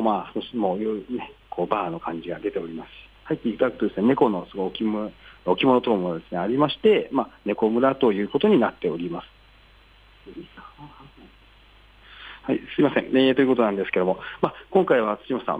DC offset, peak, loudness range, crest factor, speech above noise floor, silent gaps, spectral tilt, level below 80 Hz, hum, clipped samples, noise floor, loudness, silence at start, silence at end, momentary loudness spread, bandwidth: under 0.1%; -6 dBFS; 7 LU; 18 dB; 30 dB; none; -8.5 dB/octave; -56 dBFS; none; under 0.1%; -53 dBFS; -23 LUFS; 0 s; 0 s; 16 LU; 8 kHz